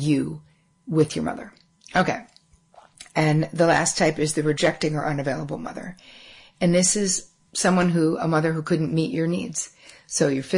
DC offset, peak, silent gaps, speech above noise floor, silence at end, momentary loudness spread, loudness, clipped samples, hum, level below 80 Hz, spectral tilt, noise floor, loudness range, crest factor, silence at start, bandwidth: under 0.1%; -8 dBFS; none; 32 dB; 0 s; 13 LU; -23 LUFS; under 0.1%; none; -56 dBFS; -4.5 dB/octave; -54 dBFS; 2 LU; 16 dB; 0 s; 11 kHz